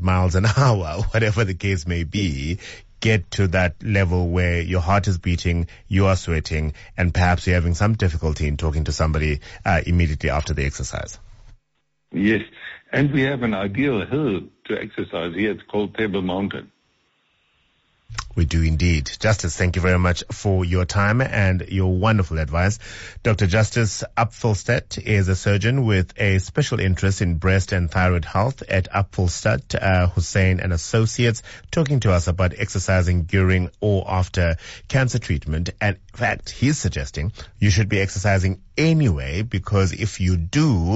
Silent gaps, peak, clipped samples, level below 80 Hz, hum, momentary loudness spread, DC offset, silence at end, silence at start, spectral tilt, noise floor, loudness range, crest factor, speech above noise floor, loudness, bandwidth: none; -6 dBFS; under 0.1%; -32 dBFS; none; 7 LU; under 0.1%; 0 s; 0 s; -6 dB/octave; -73 dBFS; 4 LU; 14 dB; 53 dB; -21 LUFS; 8 kHz